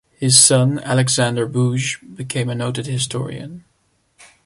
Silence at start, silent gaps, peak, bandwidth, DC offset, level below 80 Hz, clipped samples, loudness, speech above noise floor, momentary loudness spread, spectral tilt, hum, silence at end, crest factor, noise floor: 0.2 s; none; 0 dBFS; 12 kHz; under 0.1%; -56 dBFS; under 0.1%; -16 LUFS; 46 dB; 18 LU; -3.5 dB/octave; none; 0.85 s; 18 dB; -63 dBFS